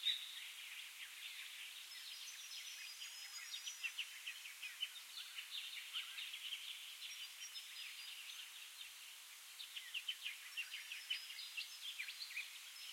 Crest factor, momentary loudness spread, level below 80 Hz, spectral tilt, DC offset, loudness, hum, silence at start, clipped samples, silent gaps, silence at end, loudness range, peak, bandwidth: 24 dB; 6 LU; under -90 dBFS; 6.5 dB/octave; under 0.1%; -48 LUFS; none; 0 s; under 0.1%; none; 0 s; 3 LU; -26 dBFS; 16.5 kHz